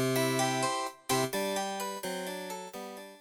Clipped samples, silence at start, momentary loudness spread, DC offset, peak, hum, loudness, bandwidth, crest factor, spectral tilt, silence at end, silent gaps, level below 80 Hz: under 0.1%; 0 s; 12 LU; under 0.1%; -16 dBFS; none; -32 LUFS; 19.5 kHz; 18 dB; -3.5 dB/octave; 0 s; none; -74 dBFS